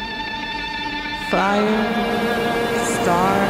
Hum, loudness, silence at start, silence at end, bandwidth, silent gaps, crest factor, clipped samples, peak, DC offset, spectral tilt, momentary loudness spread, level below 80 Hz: none; -20 LUFS; 0 s; 0 s; 16.5 kHz; none; 16 dB; under 0.1%; -4 dBFS; under 0.1%; -4.5 dB/octave; 7 LU; -42 dBFS